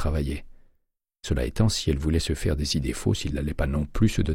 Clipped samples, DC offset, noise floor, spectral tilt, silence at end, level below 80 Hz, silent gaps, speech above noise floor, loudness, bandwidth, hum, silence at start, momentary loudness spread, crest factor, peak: under 0.1%; under 0.1%; -72 dBFS; -5.5 dB/octave; 0 s; -32 dBFS; none; 48 dB; -26 LUFS; 16 kHz; none; 0 s; 6 LU; 16 dB; -8 dBFS